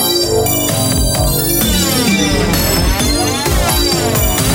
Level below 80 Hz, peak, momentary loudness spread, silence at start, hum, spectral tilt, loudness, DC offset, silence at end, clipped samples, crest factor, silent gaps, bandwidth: -22 dBFS; -2 dBFS; 1 LU; 0 s; none; -3.5 dB/octave; -12 LUFS; under 0.1%; 0 s; under 0.1%; 12 dB; none; 17 kHz